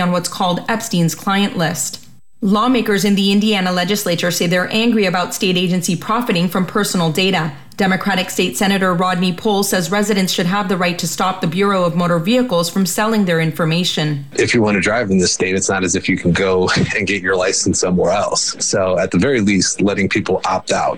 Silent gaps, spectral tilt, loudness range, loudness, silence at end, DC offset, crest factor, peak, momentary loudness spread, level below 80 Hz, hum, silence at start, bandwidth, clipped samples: none; -4 dB/octave; 1 LU; -16 LUFS; 0 s; 1%; 12 dB; -4 dBFS; 4 LU; -48 dBFS; none; 0 s; 18 kHz; under 0.1%